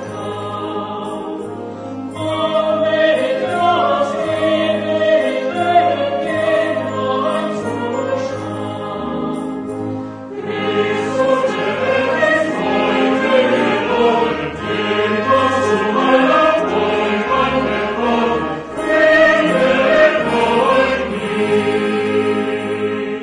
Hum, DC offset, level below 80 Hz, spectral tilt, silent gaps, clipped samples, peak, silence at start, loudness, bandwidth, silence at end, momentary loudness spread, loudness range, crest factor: none; under 0.1%; -48 dBFS; -5.5 dB/octave; none; under 0.1%; -2 dBFS; 0 s; -16 LUFS; 10 kHz; 0 s; 11 LU; 6 LU; 14 dB